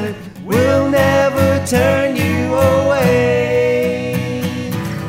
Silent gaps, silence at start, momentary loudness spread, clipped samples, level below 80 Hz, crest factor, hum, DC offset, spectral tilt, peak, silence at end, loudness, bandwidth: none; 0 s; 8 LU; under 0.1%; -40 dBFS; 14 dB; none; under 0.1%; -6 dB/octave; -2 dBFS; 0 s; -15 LUFS; 16.5 kHz